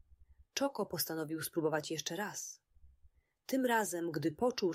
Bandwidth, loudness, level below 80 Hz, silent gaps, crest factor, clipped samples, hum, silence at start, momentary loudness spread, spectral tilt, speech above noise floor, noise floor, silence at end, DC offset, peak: 16 kHz; -37 LUFS; -70 dBFS; none; 18 dB; under 0.1%; none; 0.3 s; 11 LU; -4 dB/octave; 32 dB; -67 dBFS; 0 s; under 0.1%; -20 dBFS